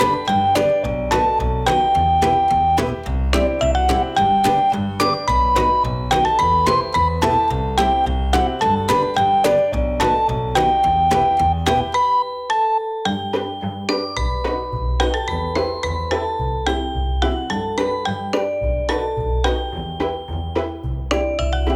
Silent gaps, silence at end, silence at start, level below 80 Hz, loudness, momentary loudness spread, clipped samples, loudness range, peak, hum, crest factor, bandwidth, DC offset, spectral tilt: none; 0 s; 0 s; -26 dBFS; -19 LUFS; 7 LU; under 0.1%; 5 LU; -4 dBFS; none; 14 dB; 15.5 kHz; under 0.1%; -5.5 dB/octave